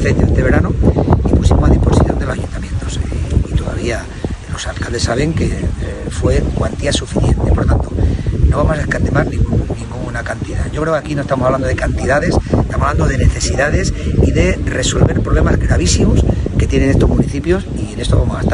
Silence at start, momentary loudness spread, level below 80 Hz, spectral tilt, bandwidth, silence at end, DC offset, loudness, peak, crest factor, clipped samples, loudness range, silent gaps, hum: 0 s; 9 LU; -18 dBFS; -6 dB/octave; 11 kHz; 0 s; under 0.1%; -15 LUFS; 0 dBFS; 14 dB; under 0.1%; 5 LU; none; none